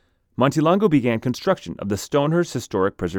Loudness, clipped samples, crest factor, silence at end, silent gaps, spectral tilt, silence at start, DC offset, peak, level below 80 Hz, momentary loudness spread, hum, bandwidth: -21 LUFS; under 0.1%; 18 dB; 0 s; none; -6.5 dB/octave; 0.4 s; under 0.1%; -4 dBFS; -52 dBFS; 8 LU; none; 18 kHz